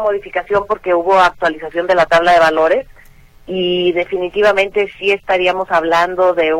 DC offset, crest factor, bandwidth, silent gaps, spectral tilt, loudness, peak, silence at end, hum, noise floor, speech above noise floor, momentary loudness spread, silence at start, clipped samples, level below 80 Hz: under 0.1%; 12 dB; 13.5 kHz; none; -4.5 dB/octave; -14 LUFS; -2 dBFS; 0 s; none; -42 dBFS; 28 dB; 8 LU; 0 s; under 0.1%; -44 dBFS